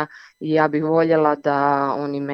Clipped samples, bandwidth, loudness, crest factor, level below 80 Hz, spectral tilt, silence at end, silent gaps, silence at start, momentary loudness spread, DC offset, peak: under 0.1%; 6.2 kHz; -19 LUFS; 16 dB; -70 dBFS; -8.5 dB/octave; 0 s; none; 0 s; 8 LU; under 0.1%; -4 dBFS